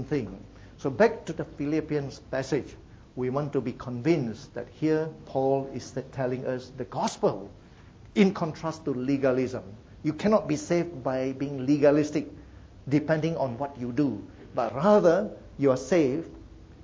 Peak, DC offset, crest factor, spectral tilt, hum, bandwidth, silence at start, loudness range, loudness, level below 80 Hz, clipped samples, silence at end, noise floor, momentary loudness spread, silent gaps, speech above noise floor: -8 dBFS; under 0.1%; 20 dB; -7 dB/octave; none; 8 kHz; 0 s; 4 LU; -27 LUFS; -54 dBFS; under 0.1%; 0 s; -50 dBFS; 13 LU; none; 23 dB